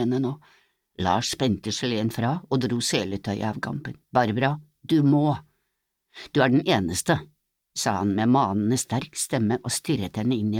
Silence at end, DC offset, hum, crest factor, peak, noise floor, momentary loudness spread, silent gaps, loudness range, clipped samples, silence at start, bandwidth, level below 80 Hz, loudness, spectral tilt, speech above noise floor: 0 s; under 0.1%; none; 20 dB; -6 dBFS; -78 dBFS; 9 LU; none; 2 LU; under 0.1%; 0 s; 16.5 kHz; -58 dBFS; -25 LUFS; -5 dB/octave; 54 dB